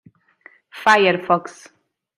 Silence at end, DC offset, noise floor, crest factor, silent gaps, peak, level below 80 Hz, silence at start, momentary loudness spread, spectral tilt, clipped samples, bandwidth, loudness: 0.7 s; under 0.1%; -51 dBFS; 20 dB; none; -2 dBFS; -66 dBFS; 0.75 s; 9 LU; -4.5 dB/octave; under 0.1%; 15.5 kHz; -17 LUFS